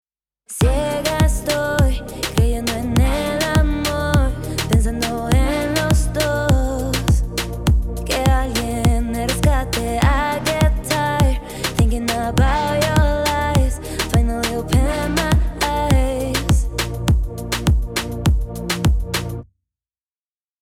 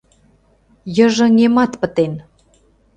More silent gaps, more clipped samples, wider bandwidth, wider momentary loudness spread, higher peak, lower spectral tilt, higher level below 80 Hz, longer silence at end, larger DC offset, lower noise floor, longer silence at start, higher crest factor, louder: neither; neither; first, 16.5 kHz vs 8.8 kHz; second, 5 LU vs 14 LU; about the same, -2 dBFS vs 0 dBFS; about the same, -5 dB/octave vs -5.5 dB/octave; first, -22 dBFS vs -52 dBFS; first, 1.2 s vs 0.75 s; neither; first, under -90 dBFS vs -55 dBFS; second, 0.5 s vs 0.85 s; about the same, 16 dB vs 16 dB; second, -19 LUFS vs -15 LUFS